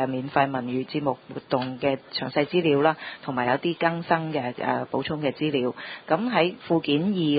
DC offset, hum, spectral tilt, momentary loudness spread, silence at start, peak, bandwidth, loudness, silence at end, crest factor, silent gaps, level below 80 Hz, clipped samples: under 0.1%; none; -10.5 dB/octave; 7 LU; 0 s; -4 dBFS; 5 kHz; -25 LUFS; 0 s; 20 dB; none; -64 dBFS; under 0.1%